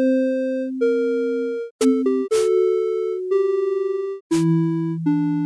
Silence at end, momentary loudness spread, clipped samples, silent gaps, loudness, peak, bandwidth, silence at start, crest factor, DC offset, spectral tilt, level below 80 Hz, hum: 0 s; 6 LU; under 0.1%; 1.71-1.79 s, 4.21-4.30 s; -21 LUFS; -8 dBFS; 11 kHz; 0 s; 12 dB; under 0.1%; -7 dB/octave; -68 dBFS; none